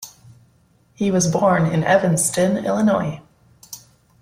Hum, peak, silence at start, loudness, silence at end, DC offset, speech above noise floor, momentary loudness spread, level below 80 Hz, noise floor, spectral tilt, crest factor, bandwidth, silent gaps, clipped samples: none; -4 dBFS; 0 s; -18 LUFS; 0.45 s; under 0.1%; 40 dB; 21 LU; -54 dBFS; -57 dBFS; -5 dB/octave; 16 dB; 16 kHz; none; under 0.1%